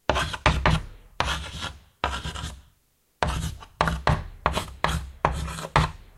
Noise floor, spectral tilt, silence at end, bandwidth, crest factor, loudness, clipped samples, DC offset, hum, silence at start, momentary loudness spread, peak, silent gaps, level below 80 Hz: -66 dBFS; -4.5 dB/octave; 0.15 s; 14 kHz; 26 dB; -27 LUFS; under 0.1%; under 0.1%; none; 0.1 s; 11 LU; 0 dBFS; none; -34 dBFS